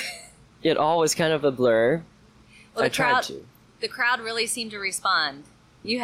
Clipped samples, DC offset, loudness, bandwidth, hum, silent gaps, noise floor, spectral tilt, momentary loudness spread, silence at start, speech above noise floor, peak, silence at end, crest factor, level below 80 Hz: under 0.1%; under 0.1%; -23 LUFS; 16 kHz; none; none; -53 dBFS; -3 dB/octave; 13 LU; 0 s; 29 dB; -12 dBFS; 0 s; 14 dB; -62 dBFS